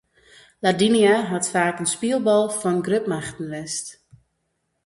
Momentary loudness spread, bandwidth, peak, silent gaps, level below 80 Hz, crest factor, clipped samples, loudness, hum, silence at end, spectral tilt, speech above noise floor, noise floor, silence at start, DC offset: 12 LU; 11.5 kHz; -6 dBFS; none; -62 dBFS; 16 dB; under 0.1%; -21 LUFS; none; 0.9 s; -4 dB/octave; 53 dB; -74 dBFS; 0.6 s; under 0.1%